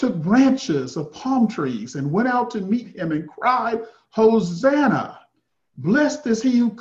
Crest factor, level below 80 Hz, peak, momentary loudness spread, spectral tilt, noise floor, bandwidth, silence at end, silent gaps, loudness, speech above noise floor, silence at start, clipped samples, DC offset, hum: 16 dB; -60 dBFS; -4 dBFS; 10 LU; -6.5 dB/octave; -71 dBFS; 7.8 kHz; 0 s; none; -21 LUFS; 51 dB; 0 s; under 0.1%; under 0.1%; none